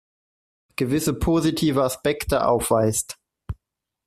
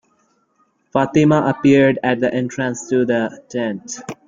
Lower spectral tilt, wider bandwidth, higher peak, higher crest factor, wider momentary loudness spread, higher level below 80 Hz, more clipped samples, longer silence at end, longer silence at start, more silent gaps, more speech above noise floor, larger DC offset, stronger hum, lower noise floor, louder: about the same, -5 dB/octave vs -6 dB/octave; first, 15.5 kHz vs 7.6 kHz; second, -6 dBFS vs -2 dBFS; about the same, 18 dB vs 16 dB; first, 18 LU vs 11 LU; first, -40 dBFS vs -56 dBFS; neither; first, 0.55 s vs 0.15 s; second, 0.8 s vs 0.95 s; neither; first, 60 dB vs 46 dB; neither; neither; first, -81 dBFS vs -62 dBFS; second, -22 LUFS vs -17 LUFS